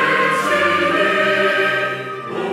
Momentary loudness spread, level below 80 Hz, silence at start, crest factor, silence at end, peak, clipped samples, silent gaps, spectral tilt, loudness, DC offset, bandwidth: 9 LU; -72 dBFS; 0 s; 14 dB; 0 s; -4 dBFS; under 0.1%; none; -4 dB/octave; -16 LUFS; under 0.1%; 16 kHz